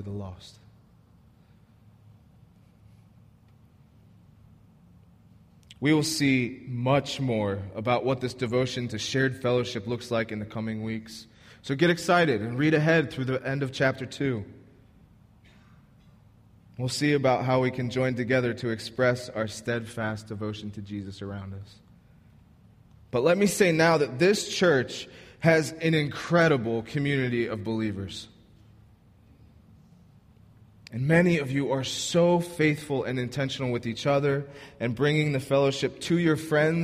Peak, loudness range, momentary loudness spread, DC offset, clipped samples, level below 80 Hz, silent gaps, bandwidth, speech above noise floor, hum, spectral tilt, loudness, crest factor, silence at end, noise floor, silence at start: -8 dBFS; 9 LU; 14 LU; under 0.1%; under 0.1%; -60 dBFS; none; 15.5 kHz; 31 dB; none; -5.5 dB/octave; -26 LUFS; 20 dB; 0 s; -57 dBFS; 0 s